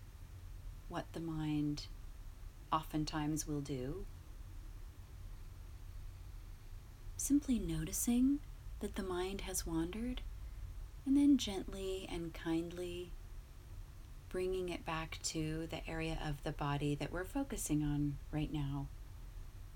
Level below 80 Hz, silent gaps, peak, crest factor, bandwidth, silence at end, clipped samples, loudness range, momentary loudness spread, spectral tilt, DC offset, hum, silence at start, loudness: -50 dBFS; none; -20 dBFS; 18 dB; 17.5 kHz; 0 s; under 0.1%; 6 LU; 20 LU; -5 dB/octave; under 0.1%; none; 0 s; -39 LUFS